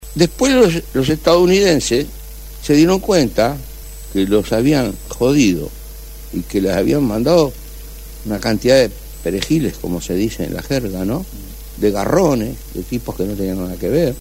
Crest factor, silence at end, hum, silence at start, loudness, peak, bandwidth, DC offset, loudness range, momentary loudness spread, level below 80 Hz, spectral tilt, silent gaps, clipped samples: 16 dB; 0 s; none; 0 s; -16 LUFS; 0 dBFS; 16.5 kHz; under 0.1%; 5 LU; 18 LU; -32 dBFS; -5.5 dB/octave; none; under 0.1%